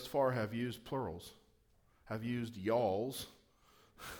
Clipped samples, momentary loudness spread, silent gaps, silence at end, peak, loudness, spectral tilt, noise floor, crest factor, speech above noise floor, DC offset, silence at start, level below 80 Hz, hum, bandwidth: under 0.1%; 17 LU; none; 0 s; -22 dBFS; -38 LUFS; -6 dB/octave; -71 dBFS; 18 dB; 33 dB; under 0.1%; 0 s; -68 dBFS; none; over 20 kHz